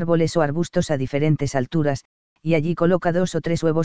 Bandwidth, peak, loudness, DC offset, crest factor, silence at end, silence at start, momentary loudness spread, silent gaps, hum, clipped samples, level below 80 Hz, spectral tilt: 8 kHz; -4 dBFS; -22 LUFS; 2%; 16 dB; 0 s; 0 s; 4 LU; 2.05-2.36 s; none; under 0.1%; -48 dBFS; -7 dB/octave